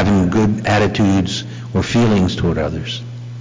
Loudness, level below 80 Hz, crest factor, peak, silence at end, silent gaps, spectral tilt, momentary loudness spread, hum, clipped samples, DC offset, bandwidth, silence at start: -17 LUFS; -32 dBFS; 8 dB; -8 dBFS; 0 s; none; -6.5 dB/octave; 10 LU; none; under 0.1%; under 0.1%; 7.6 kHz; 0 s